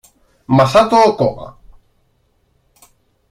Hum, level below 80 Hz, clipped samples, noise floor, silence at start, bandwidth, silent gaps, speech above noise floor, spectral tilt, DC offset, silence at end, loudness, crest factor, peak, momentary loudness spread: none; -48 dBFS; under 0.1%; -60 dBFS; 0.5 s; 15.5 kHz; none; 48 dB; -6.5 dB/octave; under 0.1%; 1.8 s; -13 LUFS; 16 dB; 0 dBFS; 20 LU